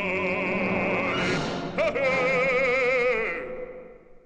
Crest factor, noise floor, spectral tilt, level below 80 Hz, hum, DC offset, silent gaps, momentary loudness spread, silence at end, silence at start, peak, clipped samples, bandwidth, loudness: 12 dB; -45 dBFS; -5.5 dB/octave; -50 dBFS; none; under 0.1%; none; 12 LU; 0.1 s; 0 s; -14 dBFS; under 0.1%; 9.4 kHz; -24 LUFS